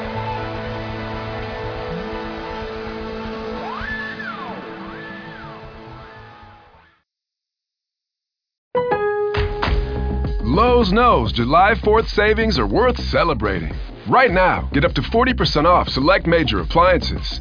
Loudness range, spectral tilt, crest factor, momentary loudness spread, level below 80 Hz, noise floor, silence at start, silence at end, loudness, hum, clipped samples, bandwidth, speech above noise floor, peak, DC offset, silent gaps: 16 LU; -6.5 dB/octave; 16 dB; 17 LU; -30 dBFS; -84 dBFS; 0 s; 0 s; -19 LUFS; none; under 0.1%; 5.4 kHz; 68 dB; -4 dBFS; under 0.1%; 8.58-8.71 s